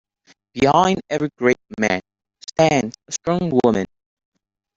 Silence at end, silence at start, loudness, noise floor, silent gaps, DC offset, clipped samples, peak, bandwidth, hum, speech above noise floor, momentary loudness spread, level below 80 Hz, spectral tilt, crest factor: 0.9 s; 0.55 s; -19 LUFS; -58 dBFS; none; under 0.1%; under 0.1%; -2 dBFS; 8 kHz; none; 40 dB; 11 LU; -52 dBFS; -5 dB/octave; 18 dB